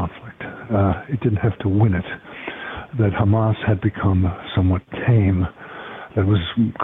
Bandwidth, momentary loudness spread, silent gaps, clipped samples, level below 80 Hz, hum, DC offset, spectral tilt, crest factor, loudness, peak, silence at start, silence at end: 3.9 kHz; 14 LU; none; under 0.1%; -42 dBFS; none; under 0.1%; -10.5 dB/octave; 12 dB; -20 LUFS; -6 dBFS; 0 s; 0 s